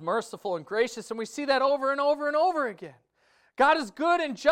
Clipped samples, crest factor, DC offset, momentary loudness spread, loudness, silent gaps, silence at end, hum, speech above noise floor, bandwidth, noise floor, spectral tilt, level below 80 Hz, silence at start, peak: under 0.1%; 18 dB; under 0.1%; 12 LU; -26 LUFS; none; 0 s; none; 39 dB; 15 kHz; -65 dBFS; -3.5 dB/octave; -72 dBFS; 0 s; -10 dBFS